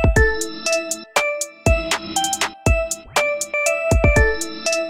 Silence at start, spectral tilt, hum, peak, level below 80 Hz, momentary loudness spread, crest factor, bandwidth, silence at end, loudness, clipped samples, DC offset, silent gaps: 0 s; -3.5 dB/octave; none; -2 dBFS; -26 dBFS; 6 LU; 16 dB; 16.5 kHz; 0 s; -19 LUFS; under 0.1%; under 0.1%; none